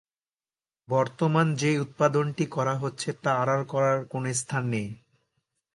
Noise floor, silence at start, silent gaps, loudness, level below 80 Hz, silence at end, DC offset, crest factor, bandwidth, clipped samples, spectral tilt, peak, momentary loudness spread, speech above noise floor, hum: under -90 dBFS; 0.9 s; none; -26 LUFS; -68 dBFS; 0.8 s; under 0.1%; 20 dB; 11.5 kHz; under 0.1%; -5.5 dB/octave; -6 dBFS; 6 LU; over 64 dB; none